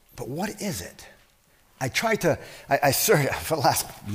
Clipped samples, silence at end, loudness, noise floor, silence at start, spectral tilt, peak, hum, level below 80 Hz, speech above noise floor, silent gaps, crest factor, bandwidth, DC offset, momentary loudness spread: under 0.1%; 0 s; -24 LUFS; -60 dBFS; 0.15 s; -3.5 dB/octave; -8 dBFS; none; -52 dBFS; 35 dB; none; 18 dB; 16 kHz; under 0.1%; 13 LU